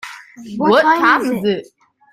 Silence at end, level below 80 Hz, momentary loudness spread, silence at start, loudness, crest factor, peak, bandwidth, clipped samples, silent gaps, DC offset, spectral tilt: 0.5 s; -60 dBFS; 20 LU; 0.05 s; -14 LUFS; 16 dB; 0 dBFS; 16 kHz; under 0.1%; none; under 0.1%; -5 dB/octave